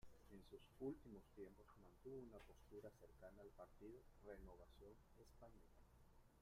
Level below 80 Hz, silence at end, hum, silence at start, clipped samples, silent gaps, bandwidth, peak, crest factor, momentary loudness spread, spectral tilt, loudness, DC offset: -72 dBFS; 0 s; none; 0 s; under 0.1%; none; 15.5 kHz; -40 dBFS; 20 dB; 13 LU; -7 dB/octave; -62 LUFS; under 0.1%